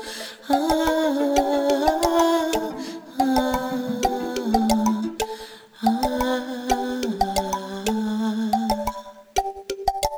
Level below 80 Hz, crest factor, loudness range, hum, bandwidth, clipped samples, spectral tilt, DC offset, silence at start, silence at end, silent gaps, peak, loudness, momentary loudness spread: -42 dBFS; 18 dB; 3 LU; none; over 20 kHz; under 0.1%; -4 dB/octave; under 0.1%; 0 s; 0 s; none; -6 dBFS; -23 LUFS; 10 LU